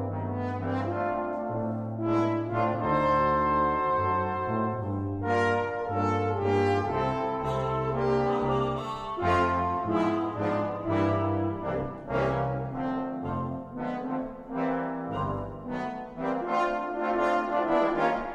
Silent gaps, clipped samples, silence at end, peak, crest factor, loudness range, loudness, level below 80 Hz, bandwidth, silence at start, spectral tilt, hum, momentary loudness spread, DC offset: none; under 0.1%; 0 s; -12 dBFS; 16 dB; 5 LU; -28 LUFS; -50 dBFS; 9.4 kHz; 0 s; -8 dB/octave; none; 8 LU; under 0.1%